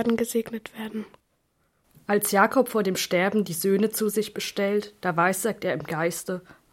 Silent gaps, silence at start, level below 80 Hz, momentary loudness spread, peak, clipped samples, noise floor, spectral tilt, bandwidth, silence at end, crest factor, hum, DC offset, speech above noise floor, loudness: none; 0 s; -66 dBFS; 14 LU; -4 dBFS; under 0.1%; -70 dBFS; -4 dB/octave; 16.5 kHz; 0.2 s; 22 dB; none; under 0.1%; 45 dB; -25 LUFS